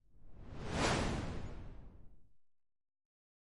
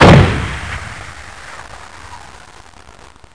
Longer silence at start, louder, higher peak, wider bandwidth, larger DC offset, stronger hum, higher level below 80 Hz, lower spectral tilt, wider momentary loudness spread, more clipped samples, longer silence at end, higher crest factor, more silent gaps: about the same, 0 s vs 0 s; second, -39 LUFS vs -13 LUFS; second, -22 dBFS vs 0 dBFS; about the same, 11.5 kHz vs 10.5 kHz; second, 0.1% vs 1%; neither; second, -50 dBFS vs -28 dBFS; second, -4.5 dB/octave vs -6.5 dB/octave; second, 22 LU vs 25 LU; neither; second, 0.55 s vs 1.2 s; first, 20 dB vs 14 dB; neither